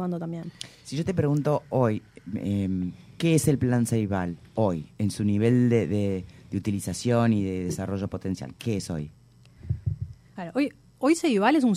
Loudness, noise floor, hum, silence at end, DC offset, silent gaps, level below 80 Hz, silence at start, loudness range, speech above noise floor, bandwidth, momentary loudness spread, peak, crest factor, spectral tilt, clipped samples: -27 LUFS; -48 dBFS; none; 0 s; under 0.1%; none; -52 dBFS; 0 s; 6 LU; 23 dB; 16 kHz; 13 LU; -6 dBFS; 20 dB; -6.5 dB/octave; under 0.1%